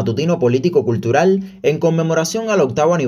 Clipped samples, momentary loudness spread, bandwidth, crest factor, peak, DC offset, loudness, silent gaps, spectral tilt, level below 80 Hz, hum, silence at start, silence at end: under 0.1%; 3 LU; 14.5 kHz; 14 dB; 0 dBFS; under 0.1%; -16 LUFS; none; -6 dB/octave; -56 dBFS; none; 0 s; 0 s